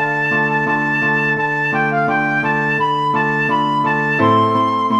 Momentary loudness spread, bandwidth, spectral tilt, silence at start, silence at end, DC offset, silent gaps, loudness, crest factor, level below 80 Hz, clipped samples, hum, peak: 3 LU; 11.5 kHz; -6.5 dB/octave; 0 s; 0 s; 0.1%; none; -16 LUFS; 14 dB; -58 dBFS; under 0.1%; none; -2 dBFS